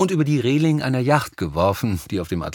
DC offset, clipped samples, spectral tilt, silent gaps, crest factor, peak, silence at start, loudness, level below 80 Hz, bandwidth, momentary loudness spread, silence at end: under 0.1%; under 0.1%; -6.5 dB/octave; none; 18 dB; -2 dBFS; 0 s; -21 LUFS; -44 dBFS; 19 kHz; 7 LU; 0 s